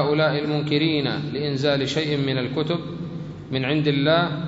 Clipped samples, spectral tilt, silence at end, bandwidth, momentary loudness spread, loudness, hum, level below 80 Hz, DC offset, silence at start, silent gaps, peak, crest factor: under 0.1%; -6.5 dB/octave; 0 s; 7.8 kHz; 9 LU; -23 LUFS; none; -54 dBFS; under 0.1%; 0 s; none; -6 dBFS; 16 dB